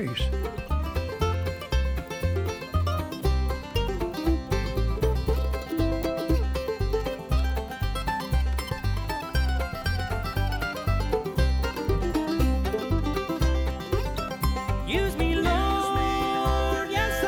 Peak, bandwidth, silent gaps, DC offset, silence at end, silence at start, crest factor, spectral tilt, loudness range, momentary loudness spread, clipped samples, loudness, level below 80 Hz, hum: -12 dBFS; over 20 kHz; none; under 0.1%; 0 s; 0 s; 14 dB; -6 dB/octave; 2 LU; 5 LU; under 0.1%; -27 LUFS; -30 dBFS; none